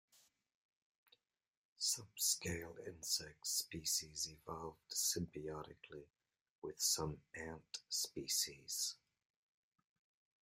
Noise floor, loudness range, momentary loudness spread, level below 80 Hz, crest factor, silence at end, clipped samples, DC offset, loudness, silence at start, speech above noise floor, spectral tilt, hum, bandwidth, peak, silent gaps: -77 dBFS; 3 LU; 15 LU; -72 dBFS; 24 dB; 1.5 s; under 0.1%; under 0.1%; -41 LUFS; 1.8 s; 34 dB; -1.5 dB/octave; none; 16 kHz; -22 dBFS; 6.41-6.62 s